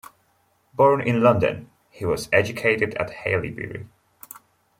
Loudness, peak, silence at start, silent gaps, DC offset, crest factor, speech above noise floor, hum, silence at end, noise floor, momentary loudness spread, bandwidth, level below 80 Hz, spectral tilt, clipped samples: -21 LUFS; -4 dBFS; 0.8 s; none; under 0.1%; 20 dB; 43 dB; none; 0.95 s; -65 dBFS; 20 LU; 16.5 kHz; -54 dBFS; -6 dB/octave; under 0.1%